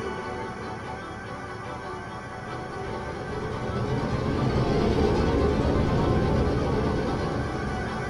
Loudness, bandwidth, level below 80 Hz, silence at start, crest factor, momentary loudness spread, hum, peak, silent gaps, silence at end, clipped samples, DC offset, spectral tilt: -28 LUFS; 11.5 kHz; -36 dBFS; 0 s; 18 dB; 12 LU; none; -10 dBFS; none; 0 s; under 0.1%; under 0.1%; -7 dB/octave